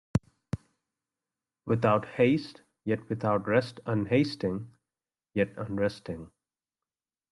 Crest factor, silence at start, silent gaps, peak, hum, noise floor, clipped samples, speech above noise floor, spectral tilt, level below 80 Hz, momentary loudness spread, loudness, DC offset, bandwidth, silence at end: 20 dB; 0.15 s; none; -10 dBFS; none; under -90 dBFS; under 0.1%; over 62 dB; -7.5 dB/octave; -60 dBFS; 15 LU; -29 LUFS; under 0.1%; 11.5 kHz; 1.05 s